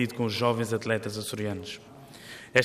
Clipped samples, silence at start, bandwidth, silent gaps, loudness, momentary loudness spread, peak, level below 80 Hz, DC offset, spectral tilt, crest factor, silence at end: under 0.1%; 0 s; 15.5 kHz; none; -29 LUFS; 17 LU; -6 dBFS; -66 dBFS; under 0.1%; -5 dB/octave; 24 dB; 0 s